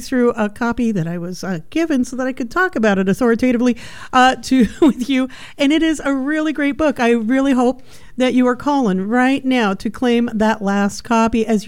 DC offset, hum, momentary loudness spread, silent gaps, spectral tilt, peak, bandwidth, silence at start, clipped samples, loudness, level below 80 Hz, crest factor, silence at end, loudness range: 1%; none; 7 LU; none; -5.5 dB/octave; -2 dBFS; 15.5 kHz; 0 s; under 0.1%; -17 LUFS; -42 dBFS; 14 dB; 0 s; 2 LU